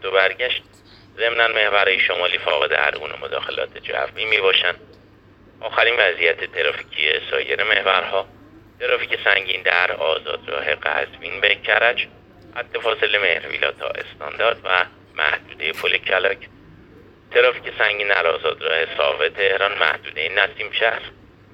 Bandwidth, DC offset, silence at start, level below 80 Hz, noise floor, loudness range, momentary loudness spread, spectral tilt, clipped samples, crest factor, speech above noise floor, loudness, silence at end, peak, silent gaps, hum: 14 kHz; under 0.1%; 0 s; -56 dBFS; -49 dBFS; 2 LU; 10 LU; -3.5 dB/octave; under 0.1%; 20 dB; 29 dB; -19 LUFS; 0.45 s; 0 dBFS; none; none